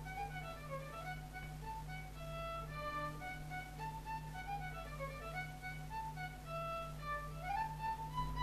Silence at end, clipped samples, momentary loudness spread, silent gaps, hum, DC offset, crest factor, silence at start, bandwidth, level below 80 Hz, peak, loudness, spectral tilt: 0 s; under 0.1%; 6 LU; none; none; under 0.1%; 18 dB; 0 s; 14 kHz; -54 dBFS; -28 dBFS; -45 LUFS; -5.5 dB/octave